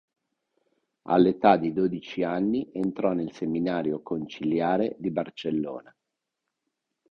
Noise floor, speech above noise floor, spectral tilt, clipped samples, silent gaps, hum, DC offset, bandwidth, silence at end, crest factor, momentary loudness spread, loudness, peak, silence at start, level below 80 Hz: -84 dBFS; 58 dB; -8 dB/octave; under 0.1%; none; none; under 0.1%; 6.6 kHz; 1.3 s; 24 dB; 10 LU; -26 LUFS; -4 dBFS; 1.05 s; -64 dBFS